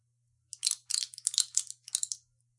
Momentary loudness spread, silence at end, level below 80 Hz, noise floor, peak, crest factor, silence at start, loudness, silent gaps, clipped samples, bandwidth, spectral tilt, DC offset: 9 LU; 0.45 s; under -90 dBFS; -75 dBFS; -2 dBFS; 34 dB; 0.65 s; -31 LUFS; none; under 0.1%; 11.5 kHz; 6 dB/octave; under 0.1%